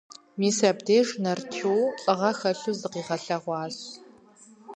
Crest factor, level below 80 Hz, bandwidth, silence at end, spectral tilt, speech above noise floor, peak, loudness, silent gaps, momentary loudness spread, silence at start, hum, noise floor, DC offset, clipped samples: 20 dB; -78 dBFS; 10 kHz; 0 s; -4.5 dB/octave; 28 dB; -8 dBFS; -26 LUFS; none; 13 LU; 0.1 s; none; -53 dBFS; under 0.1%; under 0.1%